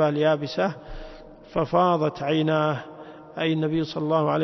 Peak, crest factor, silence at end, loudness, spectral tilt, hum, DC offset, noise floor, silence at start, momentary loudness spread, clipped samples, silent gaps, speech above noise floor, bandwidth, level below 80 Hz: -8 dBFS; 16 dB; 0 s; -24 LUFS; -7.5 dB/octave; none; under 0.1%; -43 dBFS; 0 s; 20 LU; under 0.1%; none; 20 dB; 6.2 kHz; -48 dBFS